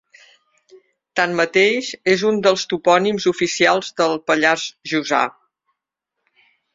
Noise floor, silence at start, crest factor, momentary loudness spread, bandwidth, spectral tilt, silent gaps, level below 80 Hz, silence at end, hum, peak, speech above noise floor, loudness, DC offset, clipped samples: -80 dBFS; 0.75 s; 18 dB; 6 LU; 7.8 kHz; -3.5 dB/octave; none; -64 dBFS; 1.45 s; none; -2 dBFS; 62 dB; -18 LUFS; under 0.1%; under 0.1%